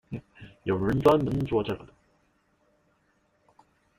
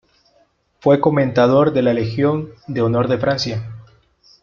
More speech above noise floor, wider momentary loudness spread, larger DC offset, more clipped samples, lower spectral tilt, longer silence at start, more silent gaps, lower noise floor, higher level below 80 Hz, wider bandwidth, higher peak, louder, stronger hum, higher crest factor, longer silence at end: about the same, 44 dB vs 43 dB; first, 17 LU vs 11 LU; neither; neither; about the same, -8 dB/octave vs -7.5 dB/octave; second, 0.1 s vs 0.85 s; neither; first, -69 dBFS vs -59 dBFS; about the same, -52 dBFS vs -52 dBFS; first, 15.5 kHz vs 7.4 kHz; second, -6 dBFS vs -2 dBFS; second, -26 LUFS vs -17 LUFS; neither; first, 24 dB vs 16 dB; first, 2.15 s vs 0.6 s